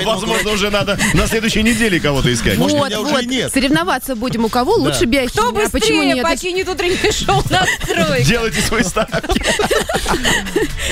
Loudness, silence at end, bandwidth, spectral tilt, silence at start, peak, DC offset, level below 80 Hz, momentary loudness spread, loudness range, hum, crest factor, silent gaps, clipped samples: -15 LUFS; 0 s; 16 kHz; -4 dB/octave; 0 s; -2 dBFS; under 0.1%; -28 dBFS; 4 LU; 1 LU; none; 14 dB; none; under 0.1%